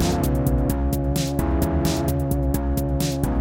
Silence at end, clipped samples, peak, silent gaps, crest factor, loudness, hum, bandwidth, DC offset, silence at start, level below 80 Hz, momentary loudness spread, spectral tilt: 0 s; under 0.1%; -6 dBFS; none; 14 dB; -23 LUFS; none; 17 kHz; under 0.1%; 0 s; -26 dBFS; 2 LU; -6.5 dB/octave